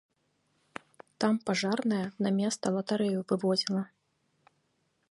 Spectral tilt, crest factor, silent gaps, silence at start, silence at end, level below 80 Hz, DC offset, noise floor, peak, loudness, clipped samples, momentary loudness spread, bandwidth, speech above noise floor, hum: -5 dB/octave; 20 dB; none; 1.2 s; 1.25 s; -76 dBFS; under 0.1%; -75 dBFS; -12 dBFS; -30 LUFS; under 0.1%; 18 LU; 11.5 kHz; 46 dB; none